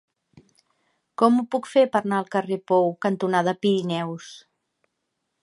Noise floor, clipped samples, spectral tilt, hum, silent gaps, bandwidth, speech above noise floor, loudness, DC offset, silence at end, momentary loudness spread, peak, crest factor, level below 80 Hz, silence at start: -78 dBFS; under 0.1%; -6.5 dB/octave; none; none; 11.5 kHz; 56 dB; -23 LUFS; under 0.1%; 1.05 s; 11 LU; -4 dBFS; 20 dB; -76 dBFS; 1.2 s